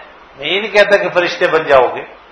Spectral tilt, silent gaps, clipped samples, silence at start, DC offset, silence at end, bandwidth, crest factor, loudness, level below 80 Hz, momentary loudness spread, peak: -4 dB/octave; none; 0.4%; 0 s; under 0.1%; 0.2 s; 12 kHz; 14 dB; -12 LUFS; -50 dBFS; 9 LU; 0 dBFS